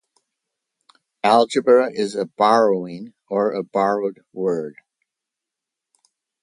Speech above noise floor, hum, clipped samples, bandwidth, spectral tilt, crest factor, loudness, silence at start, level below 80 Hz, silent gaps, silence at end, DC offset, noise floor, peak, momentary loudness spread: 66 dB; none; under 0.1%; 11.5 kHz; -5 dB/octave; 20 dB; -19 LUFS; 1.25 s; -72 dBFS; none; 1.7 s; under 0.1%; -85 dBFS; -2 dBFS; 12 LU